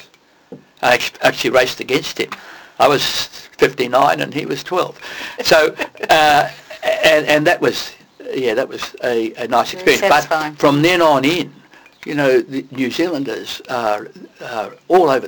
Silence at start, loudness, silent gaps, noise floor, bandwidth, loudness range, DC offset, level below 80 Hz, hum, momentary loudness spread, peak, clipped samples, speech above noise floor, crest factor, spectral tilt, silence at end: 0.5 s; -16 LUFS; none; -50 dBFS; 19.5 kHz; 3 LU; under 0.1%; -52 dBFS; none; 13 LU; -2 dBFS; under 0.1%; 34 dB; 14 dB; -4 dB/octave; 0 s